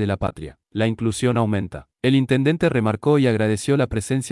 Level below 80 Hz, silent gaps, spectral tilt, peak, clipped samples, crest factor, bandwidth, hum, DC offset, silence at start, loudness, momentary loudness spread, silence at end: -46 dBFS; none; -6.5 dB/octave; -6 dBFS; under 0.1%; 14 dB; 12 kHz; none; under 0.1%; 0 s; -20 LUFS; 9 LU; 0 s